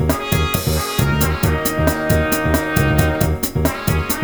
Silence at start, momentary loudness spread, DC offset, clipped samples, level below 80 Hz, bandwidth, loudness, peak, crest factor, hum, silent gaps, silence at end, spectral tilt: 0 s; 3 LU; under 0.1%; under 0.1%; -26 dBFS; over 20 kHz; -17 LUFS; 0 dBFS; 16 dB; none; none; 0 s; -5 dB/octave